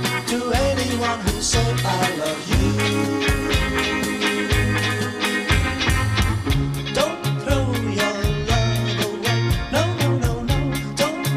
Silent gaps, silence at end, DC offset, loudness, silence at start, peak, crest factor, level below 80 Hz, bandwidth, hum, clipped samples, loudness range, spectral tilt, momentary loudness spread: none; 0 s; under 0.1%; -21 LUFS; 0 s; -4 dBFS; 16 dB; -30 dBFS; 15.5 kHz; none; under 0.1%; 1 LU; -4.5 dB/octave; 3 LU